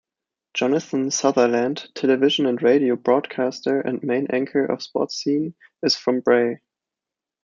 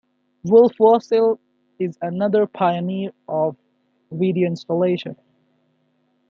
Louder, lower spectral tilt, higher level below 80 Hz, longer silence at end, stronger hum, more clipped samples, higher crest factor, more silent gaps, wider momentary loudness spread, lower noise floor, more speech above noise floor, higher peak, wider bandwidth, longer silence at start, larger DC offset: about the same, -21 LUFS vs -19 LUFS; second, -4 dB/octave vs -8.5 dB/octave; about the same, -72 dBFS vs -68 dBFS; second, 0.85 s vs 1.15 s; neither; neither; about the same, 18 dB vs 18 dB; neither; second, 7 LU vs 14 LU; first, -88 dBFS vs -65 dBFS; first, 67 dB vs 47 dB; about the same, -4 dBFS vs -2 dBFS; first, 7.4 kHz vs 6.6 kHz; about the same, 0.55 s vs 0.45 s; neither